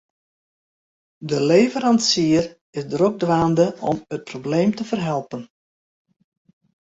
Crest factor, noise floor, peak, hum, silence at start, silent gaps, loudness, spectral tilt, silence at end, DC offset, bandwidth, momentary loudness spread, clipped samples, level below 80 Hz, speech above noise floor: 18 dB; under -90 dBFS; -4 dBFS; none; 1.2 s; 2.61-2.73 s; -20 LUFS; -5 dB/octave; 1.4 s; under 0.1%; 8 kHz; 14 LU; under 0.1%; -56 dBFS; over 71 dB